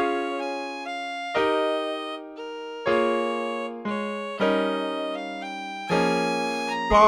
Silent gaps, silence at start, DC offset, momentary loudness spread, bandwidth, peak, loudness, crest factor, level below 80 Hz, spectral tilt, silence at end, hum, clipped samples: none; 0 s; under 0.1%; 10 LU; 16 kHz; -6 dBFS; -27 LUFS; 20 dB; -48 dBFS; -5 dB/octave; 0 s; none; under 0.1%